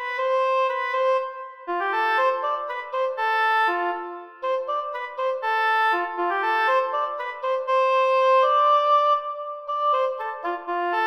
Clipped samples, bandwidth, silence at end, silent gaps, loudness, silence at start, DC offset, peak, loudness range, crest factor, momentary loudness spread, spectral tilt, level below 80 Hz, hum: under 0.1%; 14 kHz; 0 s; none; -23 LUFS; 0 s; under 0.1%; -10 dBFS; 3 LU; 12 dB; 11 LU; -1.5 dB/octave; -80 dBFS; none